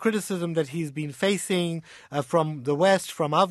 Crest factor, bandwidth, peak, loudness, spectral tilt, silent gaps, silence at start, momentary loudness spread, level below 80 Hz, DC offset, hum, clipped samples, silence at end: 18 dB; 13 kHz; -6 dBFS; -26 LUFS; -5 dB/octave; none; 0 s; 10 LU; -68 dBFS; under 0.1%; none; under 0.1%; 0 s